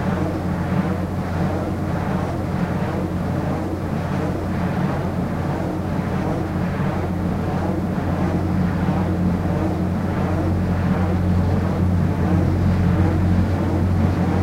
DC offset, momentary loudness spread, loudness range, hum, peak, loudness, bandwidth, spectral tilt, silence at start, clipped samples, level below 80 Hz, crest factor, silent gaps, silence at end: under 0.1%; 5 LU; 4 LU; none; -6 dBFS; -21 LUFS; 14 kHz; -8.5 dB/octave; 0 s; under 0.1%; -34 dBFS; 14 dB; none; 0 s